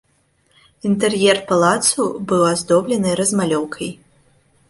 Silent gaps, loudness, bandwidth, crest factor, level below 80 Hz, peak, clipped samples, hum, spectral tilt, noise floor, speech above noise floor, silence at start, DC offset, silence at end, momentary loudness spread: none; -17 LUFS; 12 kHz; 16 dB; -56 dBFS; -2 dBFS; under 0.1%; none; -4 dB/octave; -61 dBFS; 44 dB; 0.85 s; under 0.1%; 0.75 s; 10 LU